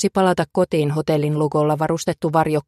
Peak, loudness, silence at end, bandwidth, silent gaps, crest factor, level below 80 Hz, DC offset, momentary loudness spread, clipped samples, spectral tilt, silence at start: -4 dBFS; -19 LUFS; 0.05 s; 13 kHz; none; 14 dB; -52 dBFS; under 0.1%; 2 LU; under 0.1%; -6.5 dB/octave; 0 s